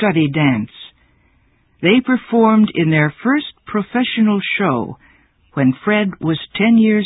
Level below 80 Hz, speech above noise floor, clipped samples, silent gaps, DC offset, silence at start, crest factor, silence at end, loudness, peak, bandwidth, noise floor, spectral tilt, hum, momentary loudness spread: -54 dBFS; 42 dB; under 0.1%; none; under 0.1%; 0 s; 16 dB; 0 s; -16 LUFS; 0 dBFS; 4 kHz; -57 dBFS; -12 dB/octave; none; 10 LU